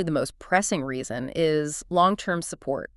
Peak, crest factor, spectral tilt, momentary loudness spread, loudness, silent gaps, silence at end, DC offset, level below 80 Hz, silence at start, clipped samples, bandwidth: -6 dBFS; 20 dB; -4.5 dB/octave; 9 LU; -25 LUFS; none; 0.1 s; under 0.1%; -54 dBFS; 0 s; under 0.1%; 12 kHz